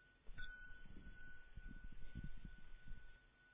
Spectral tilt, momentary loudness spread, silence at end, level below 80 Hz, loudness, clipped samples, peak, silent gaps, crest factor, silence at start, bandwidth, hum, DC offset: -4.5 dB/octave; 8 LU; 0 s; -58 dBFS; -60 LUFS; under 0.1%; -38 dBFS; none; 14 dB; 0 s; 3.8 kHz; none; under 0.1%